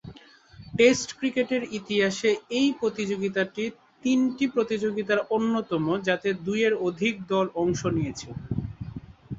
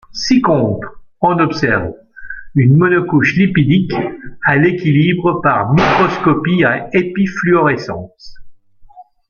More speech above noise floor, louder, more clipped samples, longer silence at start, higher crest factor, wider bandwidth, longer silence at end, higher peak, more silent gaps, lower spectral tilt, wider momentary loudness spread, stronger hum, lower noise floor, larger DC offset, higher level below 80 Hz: about the same, 25 dB vs 27 dB; second, -26 LUFS vs -13 LUFS; neither; about the same, 0.05 s vs 0.1 s; first, 20 dB vs 14 dB; first, 8 kHz vs 7 kHz; second, 0 s vs 0.3 s; second, -6 dBFS vs 0 dBFS; neither; second, -5 dB/octave vs -7 dB/octave; about the same, 10 LU vs 10 LU; neither; first, -50 dBFS vs -40 dBFS; neither; second, -54 dBFS vs -42 dBFS